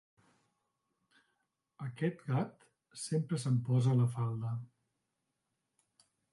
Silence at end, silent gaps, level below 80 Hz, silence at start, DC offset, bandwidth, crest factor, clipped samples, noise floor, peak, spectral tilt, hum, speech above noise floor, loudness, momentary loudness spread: 1.65 s; none; -76 dBFS; 1.8 s; under 0.1%; 11.5 kHz; 16 dB; under 0.1%; -85 dBFS; -20 dBFS; -7 dB/octave; none; 52 dB; -35 LUFS; 15 LU